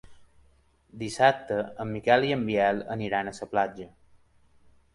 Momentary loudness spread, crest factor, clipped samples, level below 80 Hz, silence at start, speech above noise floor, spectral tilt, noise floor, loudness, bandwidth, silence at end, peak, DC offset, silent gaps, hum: 13 LU; 22 dB; under 0.1%; -60 dBFS; 0.1 s; 36 dB; -5.5 dB/octave; -63 dBFS; -27 LUFS; 11.5 kHz; 1.1 s; -6 dBFS; under 0.1%; none; none